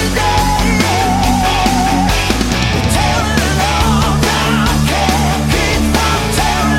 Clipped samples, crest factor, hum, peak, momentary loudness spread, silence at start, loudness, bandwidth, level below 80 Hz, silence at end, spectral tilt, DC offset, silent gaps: under 0.1%; 12 dB; none; 0 dBFS; 1 LU; 0 s; -13 LUFS; 16.5 kHz; -20 dBFS; 0 s; -4.5 dB/octave; under 0.1%; none